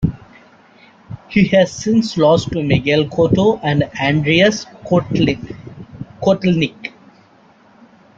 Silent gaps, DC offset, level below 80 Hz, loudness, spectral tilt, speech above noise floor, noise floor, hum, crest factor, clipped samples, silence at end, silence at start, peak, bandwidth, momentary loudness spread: none; under 0.1%; -44 dBFS; -16 LUFS; -6 dB/octave; 34 dB; -49 dBFS; none; 16 dB; under 0.1%; 1.3 s; 0 s; -2 dBFS; 7.8 kHz; 19 LU